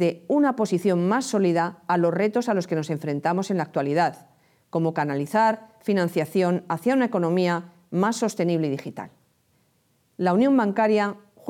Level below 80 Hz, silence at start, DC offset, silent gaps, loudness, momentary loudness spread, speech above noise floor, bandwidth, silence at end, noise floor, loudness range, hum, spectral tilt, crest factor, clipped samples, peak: -76 dBFS; 0 s; under 0.1%; none; -23 LUFS; 7 LU; 43 dB; 15.5 kHz; 0 s; -66 dBFS; 2 LU; none; -6.5 dB/octave; 14 dB; under 0.1%; -8 dBFS